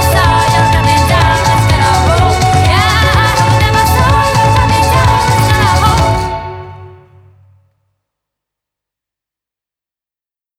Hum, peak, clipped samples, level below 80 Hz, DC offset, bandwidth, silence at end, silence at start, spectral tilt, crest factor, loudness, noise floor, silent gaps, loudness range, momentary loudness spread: none; 0 dBFS; under 0.1%; -22 dBFS; under 0.1%; 17.5 kHz; 3.7 s; 0 s; -4.5 dB/octave; 10 dB; -9 LUFS; under -90 dBFS; none; 8 LU; 2 LU